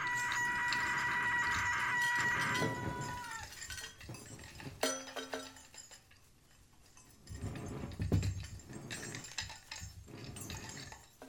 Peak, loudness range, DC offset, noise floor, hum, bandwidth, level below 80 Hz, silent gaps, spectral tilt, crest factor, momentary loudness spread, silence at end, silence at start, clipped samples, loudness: -18 dBFS; 11 LU; under 0.1%; -64 dBFS; none; over 20 kHz; -56 dBFS; none; -3.5 dB/octave; 20 dB; 18 LU; 0 s; 0 s; under 0.1%; -37 LUFS